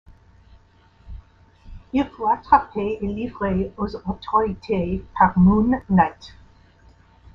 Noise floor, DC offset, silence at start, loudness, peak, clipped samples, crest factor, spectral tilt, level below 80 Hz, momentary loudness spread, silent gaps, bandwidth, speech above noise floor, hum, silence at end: -54 dBFS; under 0.1%; 1.05 s; -21 LUFS; -2 dBFS; under 0.1%; 20 dB; -9.5 dB/octave; -40 dBFS; 11 LU; none; 6 kHz; 34 dB; none; 1.05 s